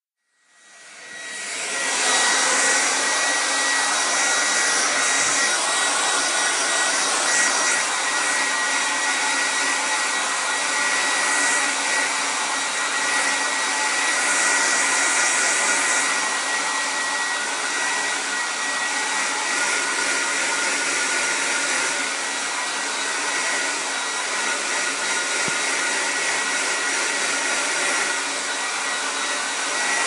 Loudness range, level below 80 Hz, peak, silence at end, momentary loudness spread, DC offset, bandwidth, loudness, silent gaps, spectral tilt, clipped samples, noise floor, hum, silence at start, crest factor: 3 LU; -80 dBFS; -6 dBFS; 0 s; 5 LU; under 0.1%; 16 kHz; -20 LUFS; none; 1.5 dB/octave; under 0.1%; -66 dBFS; none; 0.75 s; 16 dB